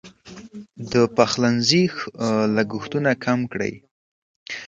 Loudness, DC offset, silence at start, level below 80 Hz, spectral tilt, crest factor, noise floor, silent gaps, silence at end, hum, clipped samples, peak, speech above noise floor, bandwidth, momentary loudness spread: -21 LUFS; under 0.1%; 0.05 s; -58 dBFS; -5 dB/octave; 22 dB; -42 dBFS; 3.91-4.46 s; 0 s; none; under 0.1%; 0 dBFS; 21 dB; 9 kHz; 20 LU